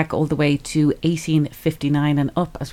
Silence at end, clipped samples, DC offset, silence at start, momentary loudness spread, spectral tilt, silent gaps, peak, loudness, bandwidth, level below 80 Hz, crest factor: 0 s; under 0.1%; under 0.1%; 0 s; 4 LU; -6.5 dB/octave; none; -4 dBFS; -20 LUFS; 15.5 kHz; -44 dBFS; 16 dB